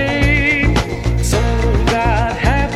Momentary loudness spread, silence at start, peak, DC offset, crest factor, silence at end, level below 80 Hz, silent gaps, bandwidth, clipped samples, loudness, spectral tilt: 4 LU; 0 s; -2 dBFS; under 0.1%; 14 dB; 0 s; -18 dBFS; none; 13.5 kHz; under 0.1%; -15 LUFS; -5.5 dB/octave